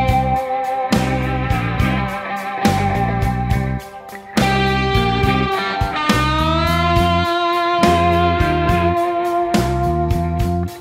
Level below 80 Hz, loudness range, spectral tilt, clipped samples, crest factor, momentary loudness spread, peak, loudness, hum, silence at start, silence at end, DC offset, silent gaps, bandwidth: -28 dBFS; 3 LU; -6 dB/octave; under 0.1%; 16 dB; 6 LU; -2 dBFS; -17 LUFS; none; 0 s; 0 s; under 0.1%; none; 16 kHz